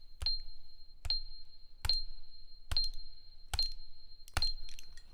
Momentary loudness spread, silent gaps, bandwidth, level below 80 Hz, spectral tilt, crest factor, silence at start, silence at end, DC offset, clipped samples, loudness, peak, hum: 22 LU; none; 14 kHz; -42 dBFS; -1.5 dB/octave; 20 dB; 0 s; 0 s; under 0.1%; under 0.1%; -37 LUFS; -18 dBFS; none